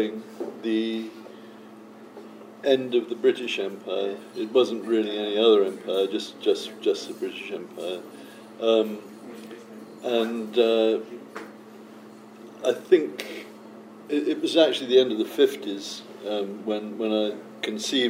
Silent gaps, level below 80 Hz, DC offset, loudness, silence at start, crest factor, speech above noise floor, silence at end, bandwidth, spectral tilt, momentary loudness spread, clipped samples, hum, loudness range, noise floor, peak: none; -84 dBFS; under 0.1%; -25 LUFS; 0 s; 20 dB; 21 dB; 0 s; 16 kHz; -4 dB/octave; 24 LU; under 0.1%; none; 5 LU; -45 dBFS; -4 dBFS